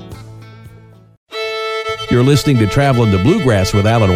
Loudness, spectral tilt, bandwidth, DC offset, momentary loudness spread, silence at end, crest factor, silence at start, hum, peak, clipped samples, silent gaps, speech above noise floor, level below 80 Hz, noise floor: -14 LUFS; -6.5 dB/octave; 16 kHz; under 0.1%; 12 LU; 0 s; 12 dB; 0 s; none; -2 dBFS; under 0.1%; 1.17-1.26 s; 30 dB; -36 dBFS; -41 dBFS